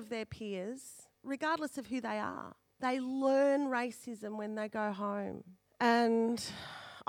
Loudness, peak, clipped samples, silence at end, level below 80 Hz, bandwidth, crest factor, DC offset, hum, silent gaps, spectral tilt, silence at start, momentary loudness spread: -35 LUFS; -16 dBFS; under 0.1%; 0.05 s; -74 dBFS; 16.5 kHz; 18 dB; under 0.1%; none; none; -4.5 dB/octave; 0 s; 17 LU